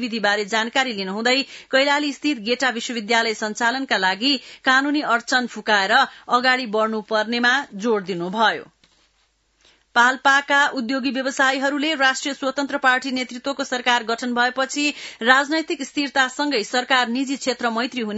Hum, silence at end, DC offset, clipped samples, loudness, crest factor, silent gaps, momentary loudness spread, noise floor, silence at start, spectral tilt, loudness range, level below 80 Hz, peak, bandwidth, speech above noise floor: none; 0 s; under 0.1%; under 0.1%; -20 LUFS; 20 dB; none; 7 LU; -65 dBFS; 0 s; -2.5 dB/octave; 2 LU; -70 dBFS; 0 dBFS; 8 kHz; 44 dB